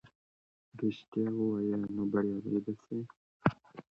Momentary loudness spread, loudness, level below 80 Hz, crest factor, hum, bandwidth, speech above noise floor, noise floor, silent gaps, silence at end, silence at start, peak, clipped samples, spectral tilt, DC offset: 9 LU; -35 LUFS; -68 dBFS; 26 dB; none; 6.4 kHz; over 57 dB; under -90 dBFS; 0.15-0.72 s, 1.08-1.12 s, 3.17-3.40 s; 0.15 s; 0.05 s; -8 dBFS; under 0.1%; -9.5 dB/octave; under 0.1%